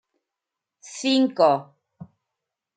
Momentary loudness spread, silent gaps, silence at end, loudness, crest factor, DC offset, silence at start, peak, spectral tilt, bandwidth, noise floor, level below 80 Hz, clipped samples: 11 LU; none; 0.75 s; -21 LUFS; 20 dB; under 0.1%; 0.85 s; -6 dBFS; -4.5 dB/octave; 9.4 kHz; -86 dBFS; -78 dBFS; under 0.1%